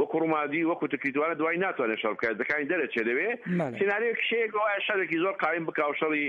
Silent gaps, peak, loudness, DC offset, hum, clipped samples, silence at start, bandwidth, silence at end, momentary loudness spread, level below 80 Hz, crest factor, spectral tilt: none; -12 dBFS; -28 LUFS; under 0.1%; none; under 0.1%; 0 s; 7.2 kHz; 0 s; 2 LU; -74 dBFS; 16 dB; -7 dB/octave